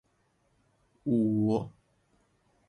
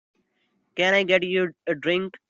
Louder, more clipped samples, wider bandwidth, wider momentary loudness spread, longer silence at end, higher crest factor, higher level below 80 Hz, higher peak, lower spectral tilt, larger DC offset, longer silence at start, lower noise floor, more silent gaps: second, -29 LUFS vs -22 LUFS; neither; first, 9.8 kHz vs 7.6 kHz; first, 13 LU vs 8 LU; first, 1 s vs 0.15 s; about the same, 16 dB vs 20 dB; about the same, -66 dBFS vs -70 dBFS; second, -16 dBFS vs -4 dBFS; first, -10 dB/octave vs -5 dB/octave; neither; first, 1.05 s vs 0.75 s; about the same, -72 dBFS vs -71 dBFS; neither